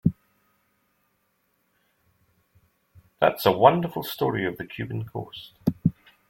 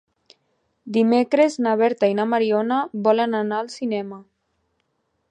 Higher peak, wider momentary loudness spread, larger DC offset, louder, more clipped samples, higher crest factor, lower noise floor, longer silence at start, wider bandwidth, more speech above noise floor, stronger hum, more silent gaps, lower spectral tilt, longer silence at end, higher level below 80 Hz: about the same, -2 dBFS vs -4 dBFS; first, 16 LU vs 8 LU; neither; second, -25 LUFS vs -20 LUFS; neither; first, 26 dB vs 18 dB; about the same, -71 dBFS vs -71 dBFS; second, 0.05 s vs 0.85 s; first, 16.5 kHz vs 9.6 kHz; second, 47 dB vs 51 dB; neither; neither; about the same, -7 dB/octave vs -6 dB/octave; second, 0.4 s vs 1.1 s; first, -58 dBFS vs -76 dBFS